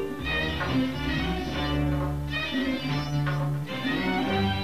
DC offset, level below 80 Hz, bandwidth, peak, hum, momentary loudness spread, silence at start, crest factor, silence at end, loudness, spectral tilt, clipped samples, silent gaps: 0.6%; -38 dBFS; 15.5 kHz; -14 dBFS; none; 3 LU; 0 s; 14 dB; 0 s; -28 LUFS; -6.5 dB/octave; under 0.1%; none